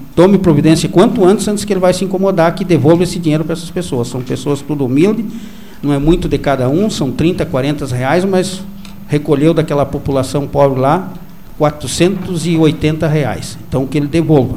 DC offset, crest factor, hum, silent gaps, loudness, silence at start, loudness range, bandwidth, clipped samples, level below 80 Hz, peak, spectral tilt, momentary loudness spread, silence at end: 3%; 12 dB; none; none; -13 LUFS; 0 s; 4 LU; 15.5 kHz; under 0.1%; -34 dBFS; 0 dBFS; -6.5 dB/octave; 9 LU; 0 s